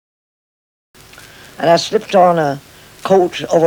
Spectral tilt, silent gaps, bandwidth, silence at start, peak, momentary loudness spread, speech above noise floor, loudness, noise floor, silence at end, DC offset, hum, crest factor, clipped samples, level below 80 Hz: -5 dB/octave; none; 19.5 kHz; 1.6 s; 0 dBFS; 10 LU; 27 dB; -14 LUFS; -39 dBFS; 0 s; under 0.1%; none; 16 dB; under 0.1%; -56 dBFS